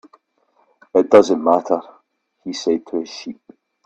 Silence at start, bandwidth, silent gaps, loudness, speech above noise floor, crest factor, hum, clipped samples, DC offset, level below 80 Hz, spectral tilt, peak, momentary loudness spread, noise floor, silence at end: 0.95 s; 8.6 kHz; none; -17 LUFS; 46 dB; 20 dB; none; under 0.1%; under 0.1%; -64 dBFS; -5 dB/octave; 0 dBFS; 19 LU; -62 dBFS; 0.55 s